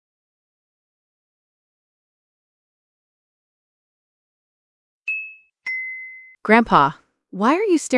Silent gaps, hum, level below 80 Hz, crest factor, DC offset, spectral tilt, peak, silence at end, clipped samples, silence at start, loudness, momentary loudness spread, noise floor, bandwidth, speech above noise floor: none; none; -58 dBFS; 22 dB; under 0.1%; -5 dB/octave; -2 dBFS; 0 s; under 0.1%; 5.05 s; -19 LUFS; 19 LU; -39 dBFS; 12 kHz; 22 dB